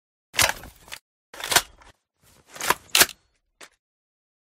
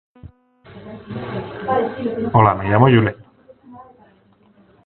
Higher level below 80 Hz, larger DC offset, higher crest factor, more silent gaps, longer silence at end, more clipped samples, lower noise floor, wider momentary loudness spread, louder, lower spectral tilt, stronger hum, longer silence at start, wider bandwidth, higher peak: second, -52 dBFS vs -46 dBFS; neither; first, 28 dB vs 20 dB; first, 1.01-1.33 s vs none; second, 0.8 s vs 1.05 s; neither; first, -60 dBFS vs -54 dBFS; first, 23 LU vs 19 LU; second, -21 LUFS vs -17 LUFS; second, 0 dB/octave vs -11.5 dB/octave; neither; about the same, 0.35 s vs 0.25 s; first, 16.5 kHz vs 4.3 kHz; about the same, 0 dBFS vs 0 dBFS